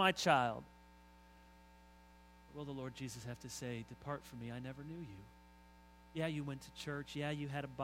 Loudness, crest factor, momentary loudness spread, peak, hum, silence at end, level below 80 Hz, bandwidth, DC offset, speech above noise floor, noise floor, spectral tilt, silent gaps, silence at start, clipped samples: -42 LUFS; 26 dB; 24 LU; -16 dBFS; 60 Hz at -65 dBFS; 0 s; -66 dBFS; 16 kHz; under 0.1%; 22 dB; -63 dBFS; -4.5 dB/octave; none; 0 s; under 0.1%